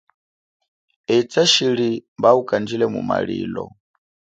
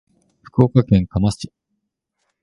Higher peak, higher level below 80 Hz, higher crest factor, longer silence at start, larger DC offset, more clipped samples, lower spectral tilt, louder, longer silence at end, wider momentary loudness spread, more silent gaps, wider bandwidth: about the same, -2 dBFS vs 0 dBFS; second, -58 dBFS vs -38 dBFS; about the same, 20 dB vs 20 dB; first, 1.1 s vs 0.55 s; neither; neither; second, -4 dB/octave vs -8 dB/octave; about the same, -19 LUFS vs -18 LUFS; second, 0.65 s vs 0.95 s; about the same, 14 LU vs 15 LU; first, 2.08-2.16 s vs none; second, 9.4 kHz vs 11.5 kHz